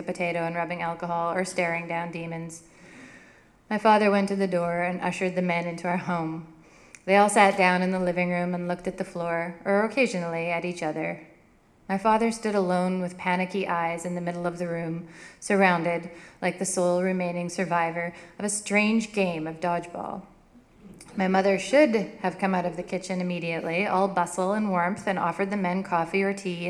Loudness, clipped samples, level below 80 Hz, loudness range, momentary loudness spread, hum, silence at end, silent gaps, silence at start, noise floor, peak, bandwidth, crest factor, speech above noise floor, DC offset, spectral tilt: -26 LUFS; under 0.1%; -62 dBFS; 4 LU; 12 LU; none; 0 s; none; 0 s; -58 dBFS; -4 dBFS; 13 kHz; 22 dB; 33 dB; under 0.1%; -5.5 dB/octave